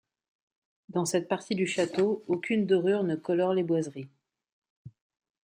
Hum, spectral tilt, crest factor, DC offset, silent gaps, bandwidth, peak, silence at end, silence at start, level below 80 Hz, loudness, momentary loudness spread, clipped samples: none; -5.5 dB/octave; 16 dB; under 0.1%; 4.52-4.62 s, 4.70-4.85 s; 16 kHz; -14 dBFS; 0.55 s; 0.9 s; -76 dBFS; -28 LUFS; 8 LU; under 0.1%